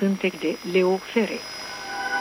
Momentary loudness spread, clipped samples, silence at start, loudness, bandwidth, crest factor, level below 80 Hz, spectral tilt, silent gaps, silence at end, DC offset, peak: 10 LU; under 0.1%; 0 s; -25 LUFS; 16 kHz; 16 dB; -64 dBFS; -5 dB/octave; none; 0 s; under 0.1%; -8 dBFS